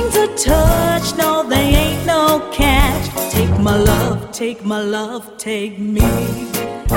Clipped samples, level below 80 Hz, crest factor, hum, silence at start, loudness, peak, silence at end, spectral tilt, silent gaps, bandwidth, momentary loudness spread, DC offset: under 0.1%; -22 dBFS; 16 dB; none; 0 s; -16 LUFS; 0 dBFS; 0 s; -5 dB/octave; none; 17 kHz; 9 LU; under 0.1%